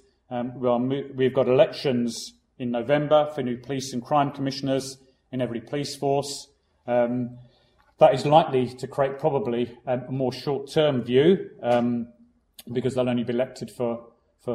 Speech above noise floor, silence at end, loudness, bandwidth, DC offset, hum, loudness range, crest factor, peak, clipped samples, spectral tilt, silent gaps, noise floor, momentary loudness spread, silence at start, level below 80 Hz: 38 dB; 0 s; -24 LUFS; 14.5 kHz; under 0.1%; none; 4 LU; 22 dB; -2 dBFS; under 0.1%; -6 dB/octave; none; -61 dBFS; 13 LU; 0.3 s; -62 dBFS